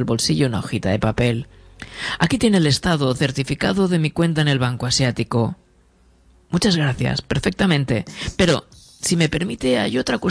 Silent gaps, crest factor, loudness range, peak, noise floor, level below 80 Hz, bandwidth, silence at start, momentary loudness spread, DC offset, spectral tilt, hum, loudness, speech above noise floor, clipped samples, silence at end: none; 20 dB; 2 LU; 0 dBFS; -55 dBFS; -42 dBFS; 11 kHz; 0 s; 8 LU; under 0.1%; -5 dB/octave; none; -20 LUFS; 36 dB; under 0.1%; 0 s